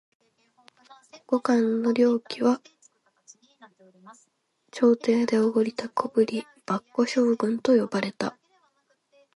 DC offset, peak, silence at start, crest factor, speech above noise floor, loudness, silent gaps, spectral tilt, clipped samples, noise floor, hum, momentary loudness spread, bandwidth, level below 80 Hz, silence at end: under 0.1%; -8 dBFS; 1.15 s; 18 dB; 48 dB; -25 LUFS; none; -5.5 dB/octave; under 0.1%; -71 dBFS; none; 9 LU; 11 kHz; -76 dBFS; 1.05 s